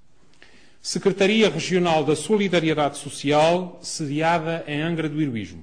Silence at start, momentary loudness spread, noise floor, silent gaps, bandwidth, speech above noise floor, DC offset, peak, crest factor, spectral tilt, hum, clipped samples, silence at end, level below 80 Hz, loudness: 0.85 s; 9 LU; -55 dBFS; none; 10 kHz; 33 dB; 0.4%; -8 dBFS; 14 dB; -5 dB/octave; none; under 0.1%; 0 s; -58 dBFS; -22 LUFS